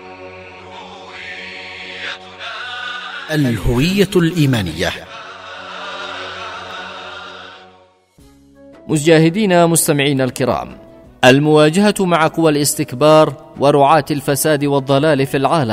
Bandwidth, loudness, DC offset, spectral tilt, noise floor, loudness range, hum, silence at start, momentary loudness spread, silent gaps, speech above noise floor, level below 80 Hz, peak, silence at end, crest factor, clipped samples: 16 kHz; -14 LUFS; under 0.1%; -5 dB/octave; -49 dBFS; 15 LU; none; 0 s; 20 LU; none; 36 dB; -38 dBFS; 0 dBFS; 0 s; 16 dB; under 0.1%